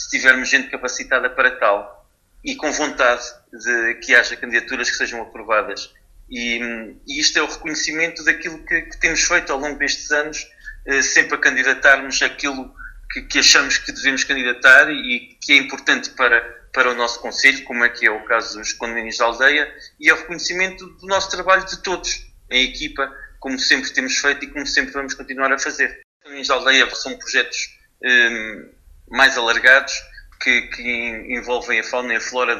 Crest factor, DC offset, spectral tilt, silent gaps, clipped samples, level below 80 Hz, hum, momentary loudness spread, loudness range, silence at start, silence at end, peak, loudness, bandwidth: 20 dB; under 0.1%; -0.5 dB/octave; 26.04-26.20 s; under 0.1%; -46 dBFS; none; 13 LU; 5 LU; 0 s; 0 s; 0 dBFS; -17 LUFS; 13 kHz